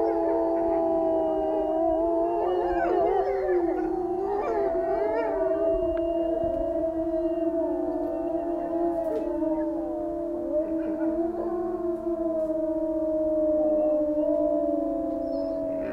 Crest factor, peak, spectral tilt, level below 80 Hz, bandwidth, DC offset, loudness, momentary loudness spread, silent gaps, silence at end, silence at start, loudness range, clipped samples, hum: 12 dB; -14 dBFS; -8.5 dB/octave; -48 dBFS; 5.6 kHz; under 0.1%; -27 LUFS; 5 LU; none; 0 s; 0 s; 3 LU; under 0.1%; none